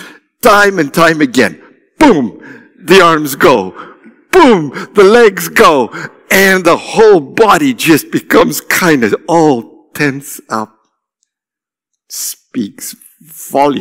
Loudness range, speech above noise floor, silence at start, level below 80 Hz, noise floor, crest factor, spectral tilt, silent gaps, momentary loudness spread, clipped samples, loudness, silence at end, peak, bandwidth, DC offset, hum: 12 LU; 78 dB; 0 s; -44 dBFS; -87 dBFS; 10 dB; -4 dB/octave; none; 14 LU; 2%; -9 LUFS; 0 s; 0 dBFS; 16.5 kHz; under 0.1%; none